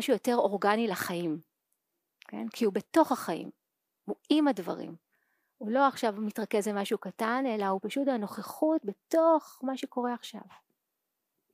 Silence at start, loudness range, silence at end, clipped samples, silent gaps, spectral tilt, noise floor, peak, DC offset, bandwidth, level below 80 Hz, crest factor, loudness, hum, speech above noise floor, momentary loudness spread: 0 s; 2 LU; 1 s; under 0.1%; none; -5 dB/octave; -84 dBFS; -10 dBFS; under 0.1%; 15.5 kHz; -86 dBFS; 20 dB; -30 LUFS; none; 55 dB; 14 LU